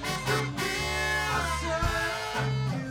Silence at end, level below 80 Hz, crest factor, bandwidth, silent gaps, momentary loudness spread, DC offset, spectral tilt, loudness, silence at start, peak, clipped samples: 0 s; -40 dBFS; 14 dB; 18.5 kHz; none; 3 LU; under 0.1%; -4 dB/octave; -28 LUFS; 0 s; -14 dBFS; under 0.1%